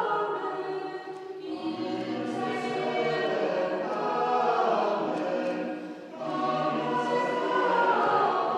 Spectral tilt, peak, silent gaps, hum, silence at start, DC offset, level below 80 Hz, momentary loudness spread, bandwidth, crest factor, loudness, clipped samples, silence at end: -5.5 dB/octave; -12 dBFS; none; none; 0 s; under 0.1%; -86 dBFS; 11 LU; 10.5 kHz; 16 dB; -28 LUFS; under 0.1%; 0 s